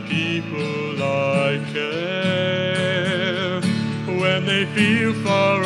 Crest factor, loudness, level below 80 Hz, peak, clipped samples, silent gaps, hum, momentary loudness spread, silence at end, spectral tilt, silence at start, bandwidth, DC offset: 18 dB; -21 LUFS; -66 dBFS; -4 dBFS; under 0.1%; none; none; 6 LU; 0 s; -5.5 dB/octave; 0 s; 11.5 kHz; under 0.1%